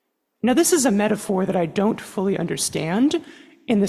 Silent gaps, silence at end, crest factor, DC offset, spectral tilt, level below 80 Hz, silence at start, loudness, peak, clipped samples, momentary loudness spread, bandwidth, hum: none; 0 s; 16 dB; under 0.1%; -4.5 dB/octave; -58 dBFS; 0.45 s; -21 LUFS; -6 dBFS; under 0.1%; 8 LU; 14.5 kHz; none